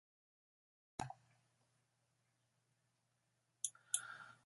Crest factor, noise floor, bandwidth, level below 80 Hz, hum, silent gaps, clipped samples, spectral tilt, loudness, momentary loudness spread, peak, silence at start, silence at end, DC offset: 34 dB; -84 dBFS; 11.5 kHz; -78 dBFS; none; none; under 0.1%; -1 dB/octave; -46 LUFS; 13 LU; -22 dBFS; 1 s; 0.1 s; under 0.1%